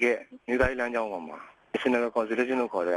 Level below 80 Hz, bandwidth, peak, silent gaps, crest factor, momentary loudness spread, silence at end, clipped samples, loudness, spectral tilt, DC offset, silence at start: -48 dBFS; 12 kHz; -12 dBFS; none; 16 dB; 11 LU; 0 s; under 0.1%; -28 LUFS; -5.5 dB/octave; under 0.1%; 0 s